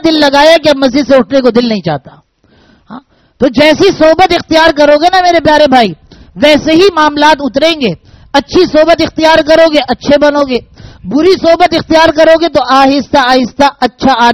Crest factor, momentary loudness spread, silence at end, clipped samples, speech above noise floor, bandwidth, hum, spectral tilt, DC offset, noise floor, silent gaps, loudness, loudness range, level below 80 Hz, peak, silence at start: 8 dB; 8 LU; 0 s; 3%; 40 dB; 14.5 kHz; none; -4.5 dB/octave; 0.7%; -46 dBFS; none; -7 LUFS; 3 LU; -36 dBFS; 0 dBFS; 0.05 s